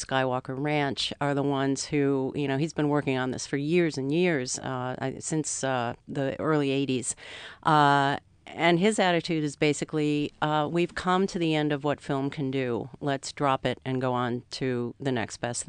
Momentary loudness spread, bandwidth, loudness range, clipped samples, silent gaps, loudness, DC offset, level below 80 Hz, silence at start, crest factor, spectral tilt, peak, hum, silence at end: 8 LU; 10 kHz; 4 LU; under 0.1%; none; -27 LUFS; under 0.1%; -60 dBFS; 0 s; 20 dB; -5 dB/octave; -8 dBFS; none; 0.05 s